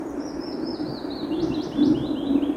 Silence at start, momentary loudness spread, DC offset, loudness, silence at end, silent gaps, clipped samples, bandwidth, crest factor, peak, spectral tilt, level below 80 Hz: 0 s; 10 LU; under 0.1%; -26 LUFS; 0 s; none; under 0.1%; 9.6 kHz; 16 dB; -8 dBFS; -7 dB/octave; -50 dBFS